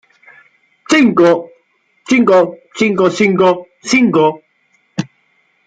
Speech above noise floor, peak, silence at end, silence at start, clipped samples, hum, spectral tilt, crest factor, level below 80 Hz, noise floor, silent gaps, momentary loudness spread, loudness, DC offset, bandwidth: 47 dB; -2 dBFS; 0.6 s; 0.9 s; under 0.1%; none; -5 dB/octave; 12 dB; -58 dBFS; -58 dBFS; none; 15 LU; -12 LUFS; under 0.1%; 9.2 kHz